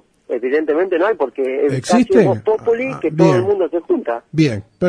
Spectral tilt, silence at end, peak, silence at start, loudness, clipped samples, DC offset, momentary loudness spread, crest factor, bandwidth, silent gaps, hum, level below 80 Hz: -7 dB/octave; 0 s; 0 dBFS; 0.3 s; -16 LUFS; under 0.1%; under 0.1%; 6 LU; 16 dB; 10.5 kHz; none; none; -54 dBFS